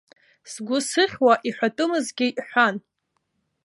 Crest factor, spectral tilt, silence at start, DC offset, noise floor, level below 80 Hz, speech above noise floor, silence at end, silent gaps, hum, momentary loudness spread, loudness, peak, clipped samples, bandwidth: 20 dB; -3 dB/octave; 0.45 s; under 0.1%; -75 dBFS; -70 dBFS; 53 dB; 0.85 s; none; none; 12 LU; -22 LUFS; -4 dBFS; under 0.1%; 11.5 kHz